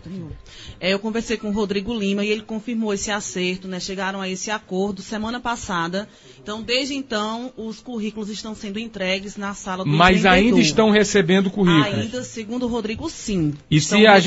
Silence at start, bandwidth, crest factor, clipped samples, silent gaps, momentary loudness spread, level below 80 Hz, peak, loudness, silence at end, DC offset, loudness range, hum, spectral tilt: 0.05 s; 8 kHz; 20 dB; under 0.1%; none; 15 LU; -44 dBFS; 0 dBFS; -21 LUFS; 0 s; under 0.1%; 9 LU; none; -4.5 dB/octave